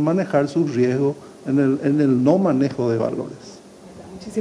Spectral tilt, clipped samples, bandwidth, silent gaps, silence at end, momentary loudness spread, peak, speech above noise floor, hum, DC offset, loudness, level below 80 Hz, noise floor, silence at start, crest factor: -8 dB/octave; under 0.1%; 10.5 kHz; none; 0 s; 16 LU; -4 dBFS; 23 dB; none; under 0.1%; -20 LUFS; -60 dBFS; -42 dBFS; 0 s; 16 dB